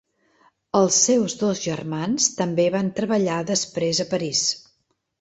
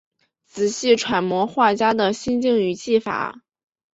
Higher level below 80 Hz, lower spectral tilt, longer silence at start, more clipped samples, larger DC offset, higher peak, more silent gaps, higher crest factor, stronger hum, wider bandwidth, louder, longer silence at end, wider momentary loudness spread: about the same, -62 dBFS vs -60 dBFS; about the same, -3.5 dB/octave vs -4 dB/octave; first, 0.75 s vs 0.55 s; neither; neither; about the same, -4 dBFS vs -4 dBFS; neither; about the same, 20 dB vs 18 dB; neither; about the same, 8.4 kHz vs 8.2 kHz; about the same, -21 LUFS vs -20 LUFS; about the same, 0.65 s vs 0.65 s; about the same, 8 LU vs 8 LU